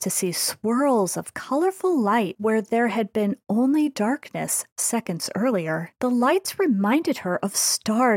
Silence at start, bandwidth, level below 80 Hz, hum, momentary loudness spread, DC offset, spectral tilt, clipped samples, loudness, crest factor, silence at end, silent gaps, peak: 0 s; 17 kHz; -72 dBFS; none; 5 LU; under 0.1%; -4 dB/octave; under 0.1%; -23 LUFS; 12 dB; 0 s; 4.72-4.76 s; -10 dBFS